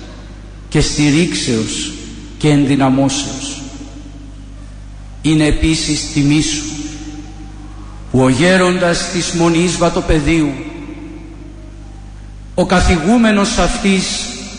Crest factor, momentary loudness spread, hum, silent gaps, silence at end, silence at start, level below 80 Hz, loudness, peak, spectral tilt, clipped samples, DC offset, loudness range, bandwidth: 14 dB; 23 LU; 50 Hz at -30 dBFS; none; 0 s; 0 s; -28 dBFS; -14 LUFS; -2 dBFS; -4.5 dB/octave; under 0.1%; under 0.1%; 4 LU; 10.5 kHz